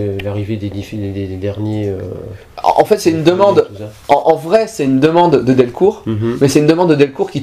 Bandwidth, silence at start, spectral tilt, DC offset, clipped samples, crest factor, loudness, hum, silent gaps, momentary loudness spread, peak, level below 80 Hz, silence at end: 15.5 kHz; 0 s; -6.5 dB/octave; under 0.1%; 0.2%; 14 dB; -13 LUFS; none; none; 12 LU; 0 dBFS; -46 dBFS; 0 s